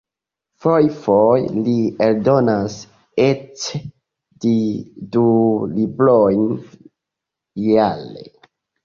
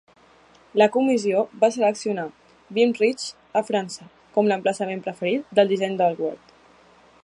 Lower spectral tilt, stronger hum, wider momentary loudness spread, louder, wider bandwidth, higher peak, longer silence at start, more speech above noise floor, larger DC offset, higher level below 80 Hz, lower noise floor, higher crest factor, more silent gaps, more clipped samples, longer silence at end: first, -7 dB/octave vs -5 dB/octave; neither; about the same, 13 LU vs 11 LU; first, -17 LUFS vs -22 LUFS; second, 7.4 kHz vs 11.5 kHz; about the same, -2 dBFS vs -4 dBFS; about the same, 0.65 s vs 0.75 s; first, 68 dB vs 32 dB; neither; first, -54 dBFS vs -72 dBFS; first, -85 dBFS vs -54 dBFS; about the same, 16 dB vs 18 dB; neither; neither; second, 0.55 s vs 0.85 s